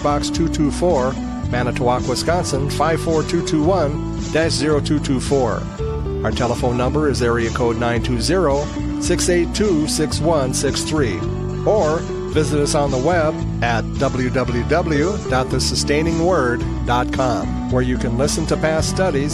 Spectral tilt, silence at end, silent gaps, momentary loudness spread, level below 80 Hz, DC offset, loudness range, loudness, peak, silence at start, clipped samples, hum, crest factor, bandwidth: -5.5 dB/octave; 0 s; none; 5 LU; -30 dBFS; under 0.1%; 1 LU; -19 LUFS; -4 dBFS; 0 s; under 0.1%; none; 14 dB; 15 kHz